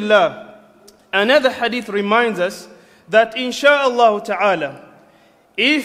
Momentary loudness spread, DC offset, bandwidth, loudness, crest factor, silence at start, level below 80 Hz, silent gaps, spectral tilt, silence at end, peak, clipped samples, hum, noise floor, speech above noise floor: 10 LU; under 0.1%; 15.5 kHz; -16 LUFS; 18 dB; 0 s; -62 dBFS; none; -3.5 dB/octave; 0 s; 0 dBFS; under 0.1%; none; -52 dBFS; 36 dB